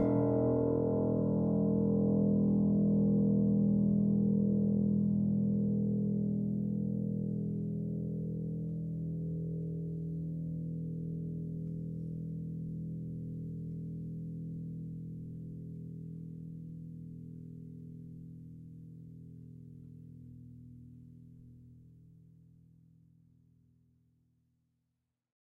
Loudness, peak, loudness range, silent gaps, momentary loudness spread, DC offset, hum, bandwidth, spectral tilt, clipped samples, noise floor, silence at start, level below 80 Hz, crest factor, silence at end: -33 LUFS; -18 dBFS; 22 LU; none; 22 LU; under 0.1%; none; 2.1 kHz; -14 dB/octave; under 0.1%; -85 dBFS; 0 s; -58 dBFS; 16 dB; 3.55 s